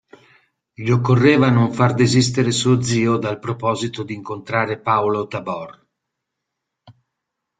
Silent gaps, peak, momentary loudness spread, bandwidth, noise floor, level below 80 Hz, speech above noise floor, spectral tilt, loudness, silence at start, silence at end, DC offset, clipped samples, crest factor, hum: none; -2 dBFS; 14 LU; 9.4 kHz; -80 dBFS; -54 dBFS; 62 dB; -5.5 dB/octave; -18 LUFS; 0.8 s; 0.7 s; under 0.1%; under 0.1%; 18 dB; none